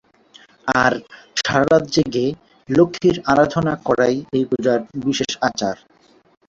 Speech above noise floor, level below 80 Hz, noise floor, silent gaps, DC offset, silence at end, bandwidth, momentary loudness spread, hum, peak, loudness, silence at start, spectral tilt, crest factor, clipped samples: 32 dB; -50 dBFS; -50 dBFS; none; under 0.1%; 0.75 s; 8 kHz; 10 LU; none; -2 dBFS; -19 LUFS; 0.65 s; -5 dB/octave; 18 dB; under 0.1%